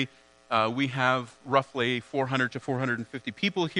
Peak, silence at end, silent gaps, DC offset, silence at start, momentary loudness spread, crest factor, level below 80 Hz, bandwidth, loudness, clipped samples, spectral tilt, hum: -8 dBFS; 0 s; none; under 0.1%; 0 s; 5 LU; 22 dB; -72 dBFS; 10.5 kHz; -28 LUFS; under 0.1%; -5.5 dB/octave; none